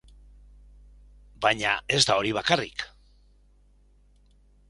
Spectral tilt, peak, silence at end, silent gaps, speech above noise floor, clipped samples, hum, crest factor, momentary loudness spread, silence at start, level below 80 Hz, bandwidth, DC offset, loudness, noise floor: -2.5 dB/octave; -4 dBFS; 1.85 s; none; 34 dB; under 0.1%; 50 Hz at -55 dBFS; 26 dB; 14 LU; 1.4 s; -54 dBFS; 11.5 kHz; under 0.1%; -24 LUFS; -59 dBFS